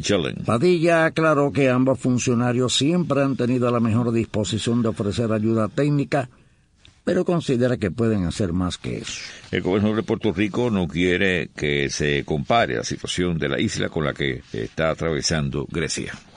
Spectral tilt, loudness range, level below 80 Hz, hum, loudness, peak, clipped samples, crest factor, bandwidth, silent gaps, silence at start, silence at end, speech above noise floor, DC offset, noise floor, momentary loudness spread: -5.5 dB/octave; 4 LU; -46 dBFS; none; -22 LUFS; -6 dBFS; under 0.1%; 16 dB; 10.5 kHz; none; 0 s; 0.15 s; 33 dB; under 0.1%; -54 dBFS; 7 LU